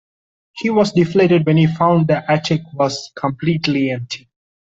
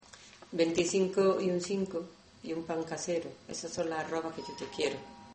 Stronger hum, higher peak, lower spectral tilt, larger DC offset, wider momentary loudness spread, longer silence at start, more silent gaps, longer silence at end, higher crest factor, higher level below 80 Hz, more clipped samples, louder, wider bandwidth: neither; first, -2 dBFS vs -16 dBFS; first, -6.5 dB/octave vs -4.5 dB/octave; neither; second, 10 LU vs 14 LU; first, 0.55 s vs 0.15 s; neither; first, 0.45 s vs 0 s; about the same, 14 dB vs 18 dB; first, -54 dBFS vs -68 dBFS; neither; first, -16 LUFS vs -33 LUFS; second, 7.8 kHz vs 8.8 kHz